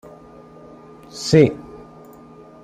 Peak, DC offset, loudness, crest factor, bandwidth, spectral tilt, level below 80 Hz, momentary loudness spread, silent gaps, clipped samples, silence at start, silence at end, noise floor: -2 dBFS; under 0.1%; -17 LUFS; 20 dB; 12.5 kHz; -6 dB/octave; -52 dBFS; 26 LU; none; under 0.1%; 1.15 s; 0.9 s; -43 dBFS